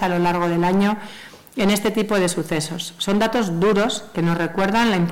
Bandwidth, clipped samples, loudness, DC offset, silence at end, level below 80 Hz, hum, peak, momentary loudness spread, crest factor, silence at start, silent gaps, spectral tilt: 16.5 kHz; under 0.1%; -20 LUFS; 0.5%; 0 s; -48 dBFS; none; -10 dBFS; 8 LU; 10 dB; 0 s; none; -5 dB/octave